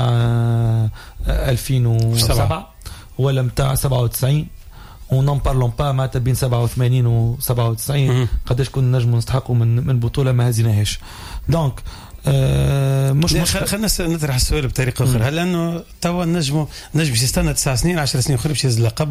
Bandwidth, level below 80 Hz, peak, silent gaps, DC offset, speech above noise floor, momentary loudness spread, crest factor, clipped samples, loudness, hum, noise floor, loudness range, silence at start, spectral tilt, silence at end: 16 kHz; -30 dBFS; -6 dBFS; none; under 0.1%; 20 dB; 6 LU; 12 dB; under 0.1%; -18 LUFS; none; -37 dBFS; 1 LU; 0 s; -5.5 dB/octave; 0 s